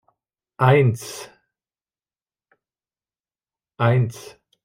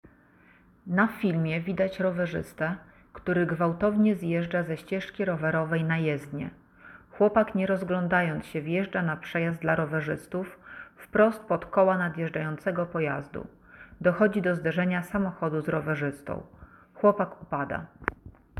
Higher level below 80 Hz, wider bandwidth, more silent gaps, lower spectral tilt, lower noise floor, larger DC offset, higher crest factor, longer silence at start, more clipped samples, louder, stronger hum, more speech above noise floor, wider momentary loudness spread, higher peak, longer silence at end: about the same, -62 dBFS vs -58 dBFS; first, 16 kHz vs 13.5 kHz; neither; second, -6.5 dB/octave vs -8 dB/octave; first, under -90 dBFS vs -58 dBFS; neither; about the same, 20 dB vs 22 dB; second, 0.6 s vs 0.85 s; neither; first, -19 LUFS vs -28 LUFS; neither; first, over 71 dB vs 31 dB; first, 22 LU vs 12 LU; about the same, -4 dBFS vs -6 dBFS; first, 0.45 s vs 0 s